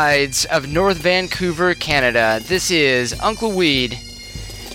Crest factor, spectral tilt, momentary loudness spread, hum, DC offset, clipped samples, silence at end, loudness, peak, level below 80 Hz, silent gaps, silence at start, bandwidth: 16 dB; -3.5 dB/octave; 13 LU; none; under 0.1%; under 0.1%; 0 s; -17 LUFS; 0 dBFS; -38 dBFS; none; 0 s; 16.5 kHz